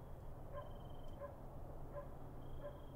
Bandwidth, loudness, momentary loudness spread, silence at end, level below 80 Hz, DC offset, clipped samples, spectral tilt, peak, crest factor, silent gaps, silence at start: 16 kHz; -54 LUFS; 3 LU; 0 s; -54 dBFS; under 0.1%; under 0.1%; -8 dB/octave; -38 dBFS; 12 dB; none; 0 s